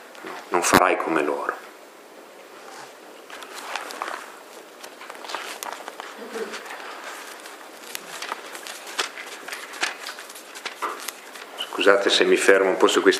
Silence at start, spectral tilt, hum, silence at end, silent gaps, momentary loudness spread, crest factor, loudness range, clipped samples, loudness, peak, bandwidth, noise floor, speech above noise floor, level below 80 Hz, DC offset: 0 s; -2.5 dB/octave; none; 0 s; none; 24 LU; 26 dB; 13 LU; under 0.1%; -24 LUFS; 0 dBFS; 15.5 kHz; -45 dBFS; 27 dB; -62 dBFS; under 0.1%